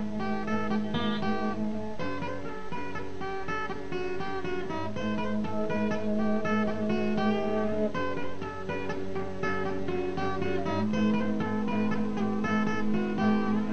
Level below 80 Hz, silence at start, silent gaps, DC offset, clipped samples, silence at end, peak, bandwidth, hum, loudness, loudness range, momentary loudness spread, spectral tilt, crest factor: -52 dBFS; 0 s; none; 2%; under 0.1%; 0 s; -14 dBFS; 8.2 kHz; none; -31 LUFS; 5 LU; 8 LU; -7 dB/octave; 14 dB